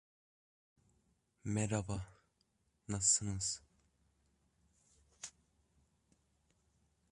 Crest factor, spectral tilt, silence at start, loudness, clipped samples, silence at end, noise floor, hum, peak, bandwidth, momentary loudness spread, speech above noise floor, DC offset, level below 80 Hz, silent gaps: 26 dB; -3.5 dB/octave; 1.45 s; -36 LUFS; under 0.1%; 1.85 s; -79 dBFS; none; -18 dBFS; 11 kHz; 21 LU; 43 dB; under 0.1%; -62 dBFS; none